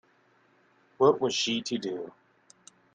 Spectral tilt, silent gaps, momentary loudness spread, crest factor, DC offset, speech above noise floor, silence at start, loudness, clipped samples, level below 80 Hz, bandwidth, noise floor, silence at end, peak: -3.5 dB/octave; none; 14 LU; 22 dB; under 0.1%; 38 dB; 1 s; -27 LUFS; under 0.1%; -76 dBFS; 9.4 kHz; -65 dBFS; 0.85 s; -8 dBFS